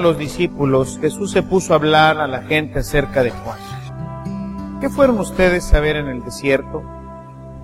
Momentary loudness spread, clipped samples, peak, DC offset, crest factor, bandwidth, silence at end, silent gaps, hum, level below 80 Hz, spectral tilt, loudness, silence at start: 15 LU; under 0.1%; 0 dBFS; under 0.1%; 18 dB; 16 kHz; 0 s; none; none; -28 dBFS; -5.5 dB/octave; -17 LUFS; 0 s